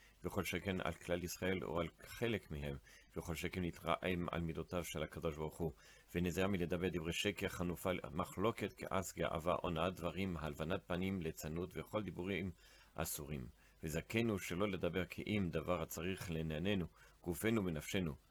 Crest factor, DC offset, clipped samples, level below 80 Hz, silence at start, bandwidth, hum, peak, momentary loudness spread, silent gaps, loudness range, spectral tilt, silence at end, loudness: 20 dB; under 0.1%; under 0.1%; -62 dBFS; 0 s; over 20 kHz; none; -22 dBFS; 8 LU; none; 3 LU; -5.5 dB/octave; 0.15 s; -42 LUFS